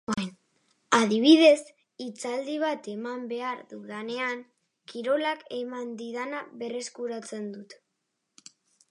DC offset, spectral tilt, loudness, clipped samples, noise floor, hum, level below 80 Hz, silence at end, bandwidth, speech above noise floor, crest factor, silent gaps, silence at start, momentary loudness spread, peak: under 0.1%; -4 dB/octave; -27 LUFS; under 0.1%; -80 dBFS; none; -76 dBFS; 1.15 s; 11.5 kHz; 53 dB; 22 dB; none; 0.1 s; 19 LU; -6 dBFS